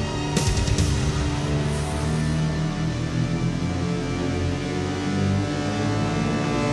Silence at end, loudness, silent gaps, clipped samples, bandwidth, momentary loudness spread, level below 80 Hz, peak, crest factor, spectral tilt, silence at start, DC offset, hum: 0 s; -24 LUFS; none; under 0.1%; 12 kHz; 3 LU; -34 dBFS; -8 dBFS; 16 dB; -5.5 dB/octave; 0 s; under 0.1%; none